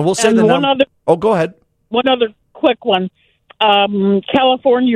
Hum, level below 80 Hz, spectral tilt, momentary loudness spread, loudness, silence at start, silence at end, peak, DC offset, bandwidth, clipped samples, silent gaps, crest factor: none; -54 dBFS; -4.5 dB/octave; 6 LU; -14 LUFS; 0 s; 0 s; 0 dBFS; under 0.1%; 13 kHz; under 0.1%; none; 14 dB